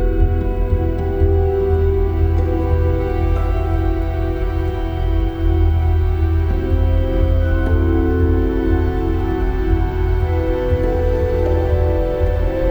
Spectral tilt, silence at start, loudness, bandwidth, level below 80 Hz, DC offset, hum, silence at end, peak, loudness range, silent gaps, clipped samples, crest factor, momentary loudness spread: -9.5 dB/octave; 0 s; -18 LUFS; 5 kHz; -18 dBFS; under 0.1%; none; 0 s; -4 dBFS; 2 LU; none; under 0.1%; 12 dB; 4 LU